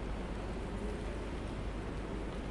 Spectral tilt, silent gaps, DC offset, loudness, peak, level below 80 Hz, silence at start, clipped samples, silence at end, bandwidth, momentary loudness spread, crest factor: -6.5 dB/octave; none; under 0.1%; -41 LUFS; -28 dBFS; -42 dBFS; 0 s; under 0.1%; 0 s; 11.5 kHz; 1 LU; 12 dB